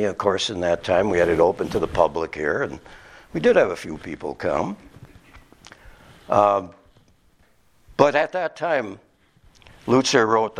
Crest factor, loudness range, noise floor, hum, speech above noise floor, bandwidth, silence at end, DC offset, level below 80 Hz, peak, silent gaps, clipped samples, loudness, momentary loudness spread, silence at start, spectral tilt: 22 dB; 4 LU; -60 dBFS; none; 39 dB; 13.5 kHz; 0 s; under 0.1%; -50 dBFS; 0 dBFS; none; under 0.1%; -21 LUFS; 15 LU; 0 s; -4.5 dB/octave